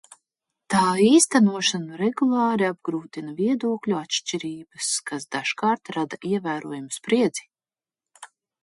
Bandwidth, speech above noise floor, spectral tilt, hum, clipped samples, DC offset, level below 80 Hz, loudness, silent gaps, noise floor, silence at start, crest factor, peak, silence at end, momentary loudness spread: 11.5 kHz; over 67 dB; -4 dB/octave; none; under 0.1%; under 0.1%; -70 dBFS; -23 LUFS; none; under -90 dBFS; 0.7 s; 20 dB; -4 dBFS; 0.35 s; 13 LU